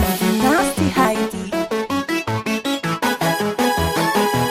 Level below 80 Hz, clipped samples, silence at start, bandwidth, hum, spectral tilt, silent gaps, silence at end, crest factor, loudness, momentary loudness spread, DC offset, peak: -38 dBFS; under 0.1%; 0 s; 16.5 kHz; none; -4.5 dB/octave; none; 0 s; 16 dB; -19 LUFS; 6 LU; under 0.1%; -2 dBFS